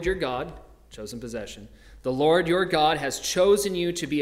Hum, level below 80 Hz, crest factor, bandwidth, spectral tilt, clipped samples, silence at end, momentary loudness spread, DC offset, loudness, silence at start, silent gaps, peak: none; -48 dBFS; 16 dB; 16 kHz; -4 dB/octave; under 0.1%; 0 s; 18 LU; under 0.1%; -24 LUFS; 0 s; none; -8 dBFS